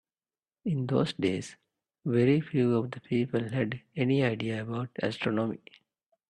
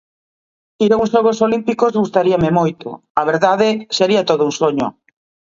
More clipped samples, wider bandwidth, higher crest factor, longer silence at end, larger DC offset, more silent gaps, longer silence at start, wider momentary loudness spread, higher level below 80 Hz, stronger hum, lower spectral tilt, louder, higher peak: neither; first, 10.5 kHz vs 7.6 kHz; about the same, 18 dB vs 16 dB; about the same, 0.75 s vs 0.65 s; neither; second, none vs 3.10-3.15 s; second, 0.65 s vs 0.8 s; about the same, 9 LU vs 7 LU; second, -68 dBFS vs -52 dBFS; neither; first, -7.5 dB/octave vs -5.5 dB/octave; second, -30 LUFS vs -16 LUFS; second, -12 dBFS vs 0 dBFS